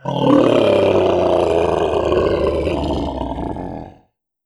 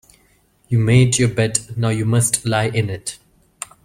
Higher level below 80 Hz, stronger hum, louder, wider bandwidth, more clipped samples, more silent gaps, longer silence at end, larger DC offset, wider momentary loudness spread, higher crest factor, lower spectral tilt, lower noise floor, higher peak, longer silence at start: first, -34 dBFS vs -48 dBFS; neither; about the same, -16 LUFS vs -18 LUFS; second, 10.5 kHz vs 15.5 kHz; neither; neither; second, 0.55 s vs 0.7 s; neither; second, 12 LU vs 15 LU; about the same, 14 dB vs 18 dB; first, -7 dB/octave vs -5 dB/octave; about the same, -56 dBFS vs -57 dBFS; about the same, -2 dBFS vs 0 dBFS; second, 0.05 s vs 0.7 s